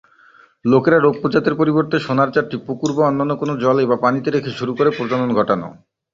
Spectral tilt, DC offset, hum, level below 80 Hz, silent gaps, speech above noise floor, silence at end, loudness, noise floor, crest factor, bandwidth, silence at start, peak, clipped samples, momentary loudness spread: -7 dB/octave; under 0.1%; none; -56 dBFS; none; 33 dB; 0.4 s; -17 LUFS; -50 dBFS; 16 dB; 7.6 kHz; 0.65 s; -2 dBFS; under 0.1%; 8 LU